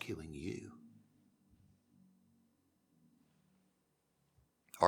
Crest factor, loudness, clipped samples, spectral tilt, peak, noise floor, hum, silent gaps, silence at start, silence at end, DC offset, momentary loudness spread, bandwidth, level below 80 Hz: 34 dB; -47 LUFS; under 0.1%; -5.5 dB/octave; -12 dBFS; -80 dBFS; none; none; 0 s; 0 s; under 0.1%; 19 LU; 19 kHz; -70 dBFS